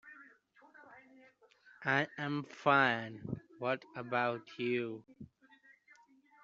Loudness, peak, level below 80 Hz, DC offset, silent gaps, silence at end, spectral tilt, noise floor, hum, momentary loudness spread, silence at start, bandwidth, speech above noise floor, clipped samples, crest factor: -35 LUFS; -14 dBFS; -76 dBFS; under 0.1%; none; 1.2 s; -3.5 dB/octave; -65 dBFS; none; 27 LU; 0.05 s; 7.6 kHz; 30 dB; under 0.1%; 24 dB